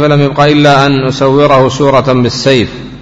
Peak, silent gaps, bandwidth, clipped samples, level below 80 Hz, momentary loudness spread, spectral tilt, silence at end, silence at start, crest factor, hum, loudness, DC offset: 0 dBFS; none; 8 kHz; 1%; -36 dBFS; 4 LU; -6 dB/octave; 0 s; 0 s; 8 dB; none; -8 LUFS; under 0.1%